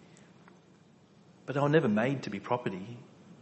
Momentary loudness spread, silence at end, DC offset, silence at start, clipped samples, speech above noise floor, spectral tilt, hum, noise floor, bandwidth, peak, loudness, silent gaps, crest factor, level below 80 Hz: 21 LU; 0.1 s; under 0.1%; 1.45 s; under 0.1%; 30 dB; -7.5 dB/octave; none; -60 dBFS; 8.4 kHz; -12 dBFS; -30 LUFS; none; 22 dB; -72 dBFS